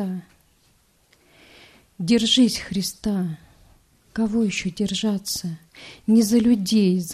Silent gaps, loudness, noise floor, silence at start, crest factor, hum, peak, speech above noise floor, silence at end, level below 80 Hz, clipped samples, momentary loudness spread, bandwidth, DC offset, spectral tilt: none; -21 LUFS; -61 dBFS; 0 s; 16 dB; none; -8 dBFS; 40 dB; 0 s; -52 dBFS; under 0.1%; 17 LU; 14.5 kHz; under 0.1%; -4.5 dB/octave